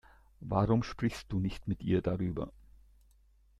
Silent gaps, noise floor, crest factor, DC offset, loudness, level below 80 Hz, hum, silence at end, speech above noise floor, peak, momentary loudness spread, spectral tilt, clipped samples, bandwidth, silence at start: none; -65 dBFS; 20 dB; under 0.1%; -33 LUFS; -52 dBFS; none; 1.1 s; 32 dB; -14 dBFS; 10 LU; -8 dB/octave; under 0.1%; 12.5 kHz; 0.4 s